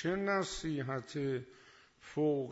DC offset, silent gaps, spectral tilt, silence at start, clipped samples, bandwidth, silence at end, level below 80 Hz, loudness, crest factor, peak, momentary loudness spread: under 0.1%; none; -5.5 dB/octave; 0 s; under 0.1%; 8 kHz; 0 s; -62 dBFS; -36 LUFS; 14 dB; -22 dBFS; 11 LU